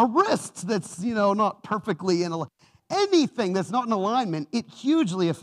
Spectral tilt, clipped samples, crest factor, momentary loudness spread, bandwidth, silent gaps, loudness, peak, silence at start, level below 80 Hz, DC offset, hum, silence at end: -5.5 dB/octave; under 0.1%; 16 dB; 8 LU; 12.5 kHz; none; -25 LUFS; -8 dBFS; 0 s; -72 dBFS; under 0.1%; none; 0 s